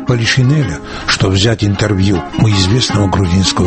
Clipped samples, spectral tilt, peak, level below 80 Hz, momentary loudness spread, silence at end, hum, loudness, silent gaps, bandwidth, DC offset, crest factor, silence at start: under 0.1%; -5 dB/octave; 0 dBFS; -32 dBFS; 4 LU; 0 s; none; -12 LUFS; none; 8.8 kHz; under 0.1%; 12 dB; 0 s